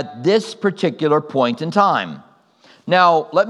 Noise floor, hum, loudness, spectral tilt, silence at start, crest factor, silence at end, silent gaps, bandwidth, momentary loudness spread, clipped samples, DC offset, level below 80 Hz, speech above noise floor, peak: -51 dBFS; none; -17 LUFS; -6 dB/octave; 0 s; 18 dB; 0 s; none; 11.5 kHz; 8 LU; under 0.1%; under 0.1%; -76 dBFS; 34 dB; 0 dBFS